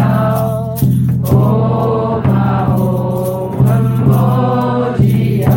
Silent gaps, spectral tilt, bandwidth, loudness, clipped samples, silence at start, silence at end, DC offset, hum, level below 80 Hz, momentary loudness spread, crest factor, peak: none; -9 dB/octave; 17 kHz; -13 LUFS; under 0.1%; 0 s; 0 s; under 0.1%; none; -34 dBFS; 4 LU; 12 dB; 0 dBFS